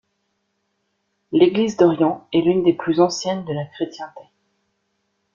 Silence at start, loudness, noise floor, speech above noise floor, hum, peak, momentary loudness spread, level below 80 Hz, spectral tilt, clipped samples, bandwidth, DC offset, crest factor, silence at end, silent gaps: 1.3 s; -19 LUFS; -72 dBFS; 53 dB; none; -2 dBFS; 12 LU; -62 dBFS; -6 dB/octave; under 0.1%; 7.6 kHz; under 0.1%; 18 dB; 1.15 s; none